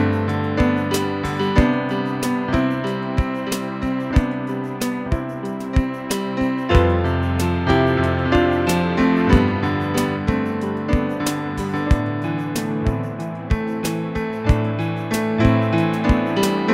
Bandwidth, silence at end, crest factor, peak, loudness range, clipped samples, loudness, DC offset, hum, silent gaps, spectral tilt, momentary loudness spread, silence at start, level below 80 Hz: 16 kHz; 0 s; 16 dB; -4 dBFS; 5 LU; under 0.1%; -20 LUFS; under 0.1%; none; none; -6.5 dB/octave; 7 LU; 0 s; -28 dBFS